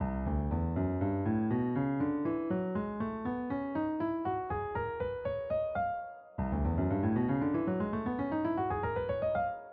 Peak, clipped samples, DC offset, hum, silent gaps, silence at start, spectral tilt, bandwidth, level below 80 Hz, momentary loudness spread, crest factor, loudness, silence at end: -20 dBFS; under 0.1%; under 0.1%; none; none; 0 s; -8.5 dB/octave; 4.7 kHz; -46 dBFS; 5 LU; 12 dB; -33 LUFS; 0 s